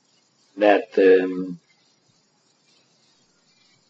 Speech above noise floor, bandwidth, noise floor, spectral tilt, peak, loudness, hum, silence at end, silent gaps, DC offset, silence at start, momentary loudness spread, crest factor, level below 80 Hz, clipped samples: 46 dB; 7.4 kHz; -64 dBFS; -6.5 dB/octave; -4 dBFS; -19 LUFS; none; 2.35 s; none; under 0.1%; 0.55 s; 17 LU; 20 dB; -84 dBFS; under 0.1%